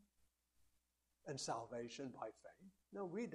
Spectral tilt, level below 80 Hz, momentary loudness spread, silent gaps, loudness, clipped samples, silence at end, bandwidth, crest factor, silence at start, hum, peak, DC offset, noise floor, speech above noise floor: -4 dB/octave; -84 dBFS; 17 LU; none; -49 LUFS; under 0.1%; 0 s; 13 kHz; 20 dB; 1.25 s; 60 Hz at -75 dBFS; -32 dBFS; under 0.1%; -84 dBFS; 35 dB